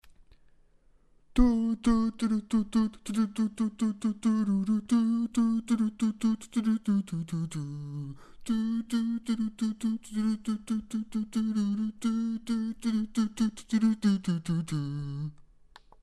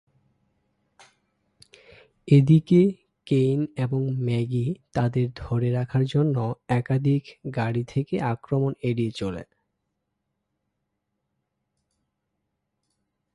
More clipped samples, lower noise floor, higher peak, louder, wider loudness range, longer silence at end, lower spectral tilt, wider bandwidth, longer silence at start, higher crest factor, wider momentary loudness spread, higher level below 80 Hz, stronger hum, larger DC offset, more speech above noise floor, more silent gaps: neither; second, -62 dBFS vs -79 dBFS; second, -10 dBFS vs -6 dBFS; second, -30 LUFS vs -24 LUFS; second, 3 LU vs 9 LU; second, 0.7 s vs 3.9 s; second, -6.5 dB/octave vs -9 dB/octave; first, 12 kHz vs 10.5 kHz; second, 0.05 s vs 2.25 s; about the same, 20 dB vs 20 dB; about the same, 8 LU vs 9 LU; first, -46 dBFS vs -56 dBFS; neither; neither; second, 32 dB vs 56 dB; neither